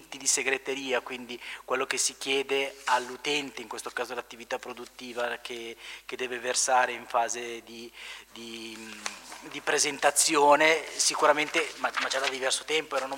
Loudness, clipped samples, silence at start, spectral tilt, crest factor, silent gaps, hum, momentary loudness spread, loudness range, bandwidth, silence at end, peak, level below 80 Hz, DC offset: -27 LUFS; under 0.1%; 0 s; -0.5 dB/octave; 22 dB; none; none; 17 LU; 8 LU; 16 kHz; 0 s; -8 dBFS; -70 dBFS; under 0.1%